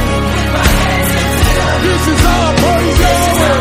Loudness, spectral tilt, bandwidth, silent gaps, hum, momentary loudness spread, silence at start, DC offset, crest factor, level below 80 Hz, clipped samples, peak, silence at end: -11 LUFS; -4.5 dB/octave; 16.5 kHz; none; none; 2 LU; 0 s; under 0.1%; 10 dB; -18 dBFS; 0.1%; 0 dBFS; 0 s